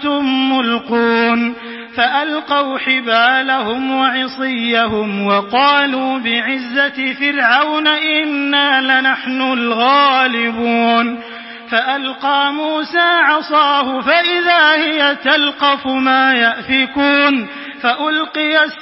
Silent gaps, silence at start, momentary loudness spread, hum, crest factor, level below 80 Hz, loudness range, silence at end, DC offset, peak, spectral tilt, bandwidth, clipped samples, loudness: none; 0 s; 7 LU; none; 14 dB; -56 dBFS; 3 LU; 0 s; under 0.1%; 0 dBFS; -6.5 dB/octave; 5.8 kHz; under 0.1%; -13 LUFS